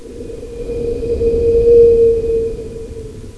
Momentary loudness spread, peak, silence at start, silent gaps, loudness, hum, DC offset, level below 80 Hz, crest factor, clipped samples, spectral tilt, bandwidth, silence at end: 21 LU; 0 dBFS; 0 s; none; -13 LUFS; none; under 0.1%; -28 dBFS; 14 dB; under 0.1%; -8 dB/octave; 11 kHz; 0 s